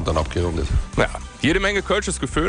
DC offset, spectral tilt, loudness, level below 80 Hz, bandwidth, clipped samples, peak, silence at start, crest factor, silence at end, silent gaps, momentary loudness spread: under 0.1%; -4.5 dB/octave; -22 LUFS; -28 dBFS; 10.5 kHz; under 0.1%; -6 dBFS; 0 s; 14 dB; 0 s; none; 4 LU